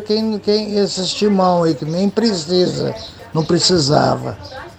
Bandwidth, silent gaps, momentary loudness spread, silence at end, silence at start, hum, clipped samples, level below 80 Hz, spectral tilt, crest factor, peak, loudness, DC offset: 9.4 kHz; none; 10 LU; 0.05 s; 0 s; none; under 0.1%; -48 dBFS; -5 dB/octave; 16 dB; 0 dBFS; -16 LUFS; under 0.1%